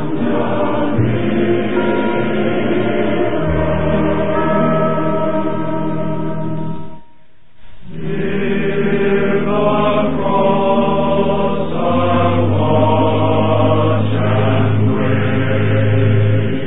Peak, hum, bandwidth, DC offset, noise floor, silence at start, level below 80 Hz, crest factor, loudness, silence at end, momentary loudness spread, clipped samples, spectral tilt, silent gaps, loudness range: 0 dBFS; none; 4 kHz; 9%; -52 dBFS; 0 s; -36 dBFS; 14 dB; -16 LUFS; 0 s; 6 LU; under 0.1%; -13 dB/octave; none; 6 LU